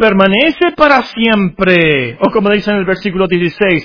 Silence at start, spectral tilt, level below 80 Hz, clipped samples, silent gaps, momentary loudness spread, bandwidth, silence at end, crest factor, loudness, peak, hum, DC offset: 0 s; -7.5 dB/octave; -40 dBFS; 0.7%; none; 5 LU; 5.4 kHz; 0 s; 10 dB; -11 LUFS; 0 dBFS; none; under 0.1%